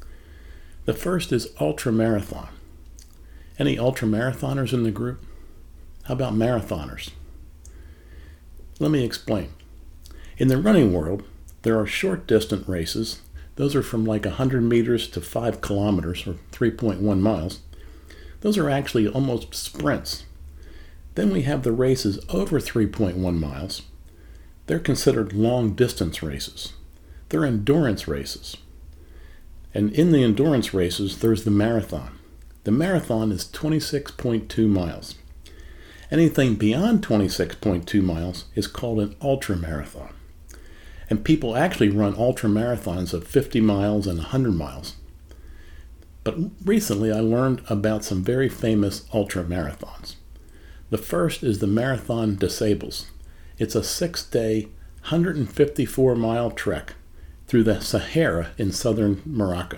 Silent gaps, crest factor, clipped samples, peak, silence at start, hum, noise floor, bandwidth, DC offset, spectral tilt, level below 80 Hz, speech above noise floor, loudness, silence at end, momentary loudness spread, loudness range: none; 20 dB; under 0.1%; -4 dBFS; 0 s; none; -45 dBFS; 19 kHz; under 0.1%; -6 dB/octave; -40 dBFS; 22 dB; -23 LUFS; 0 s; 12 LU; 4 LU